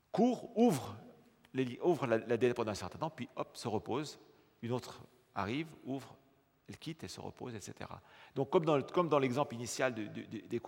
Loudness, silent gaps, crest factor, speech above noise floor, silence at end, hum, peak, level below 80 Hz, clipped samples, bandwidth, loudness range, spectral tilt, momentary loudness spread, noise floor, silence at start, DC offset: -36 LUFS; none; 22 dB; 25 dB; 0 s; none; -16 dBFS; -76 dBFS; under 0.1%; 16.5 kHz; 9 LU; -6 dB/octave; 17 LU; -61 dBFS; 0.15 s; under 0.1%